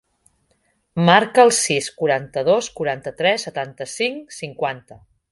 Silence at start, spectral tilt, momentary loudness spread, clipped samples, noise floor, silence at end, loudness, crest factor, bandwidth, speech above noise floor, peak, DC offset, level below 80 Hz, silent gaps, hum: 0.95 s; -3.5 dB/octave; 15 LU; under 0.1%; -65 dBFS; 0.35 s; -19 LUFS; 20 dB; 11.5 kHz; 46 dB; 0 dBFS; under 0.1%; -60 dBFS; none; none